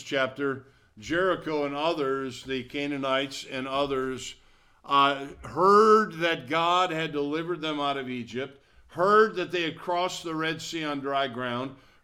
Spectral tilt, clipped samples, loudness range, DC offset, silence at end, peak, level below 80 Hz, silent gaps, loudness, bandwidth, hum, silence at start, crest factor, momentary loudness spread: -4.5 dB/octave; under 0.1%; 6 LU; under 0.1%; 0.3 s; -8 dBFS; -60 dBFS; none; -26 LUFS; 14.5 kHz; none; 0 s; 20 dB; 13 LU